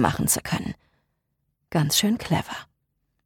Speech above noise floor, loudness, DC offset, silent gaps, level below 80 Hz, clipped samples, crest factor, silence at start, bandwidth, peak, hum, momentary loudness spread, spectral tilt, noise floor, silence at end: 51 dB; -24 LUFS; under 0.1%; none; -50 dBFS; under 0.1%; 22 dB; 0 s; 19 kHz; -6 dBFS; none; 16 LU; -3.5 dB/octave; -75 dBFS; 0.65 s